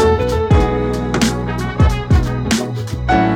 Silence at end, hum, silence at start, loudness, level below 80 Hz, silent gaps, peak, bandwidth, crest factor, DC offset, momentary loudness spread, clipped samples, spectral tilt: 0 s; none; 0 s; -16 LUFS; -22 dBFS; none; -2 dBFS; 16.5 kHz; 12 dB; under 0.1%; 6 LU; under 0.1%; -6 dB/octave